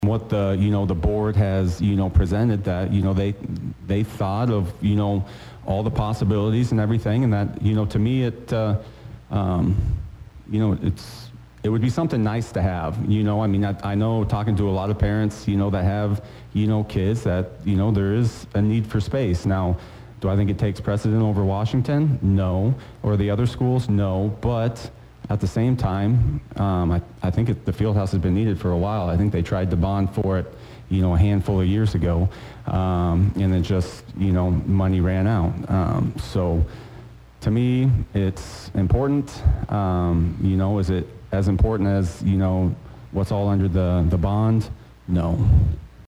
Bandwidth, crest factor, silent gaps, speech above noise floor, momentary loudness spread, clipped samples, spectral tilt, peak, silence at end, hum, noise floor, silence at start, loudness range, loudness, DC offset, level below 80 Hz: 10.5 kHz; 16 dB; none; 22 dB; 7 LU; under 0.1%; -8.5 dB/octave; -6 dBFS; 0 s; none; -42 dBFS; 0 s; 2 LU; -22 LUFS; under 0.1%; -34 dBFS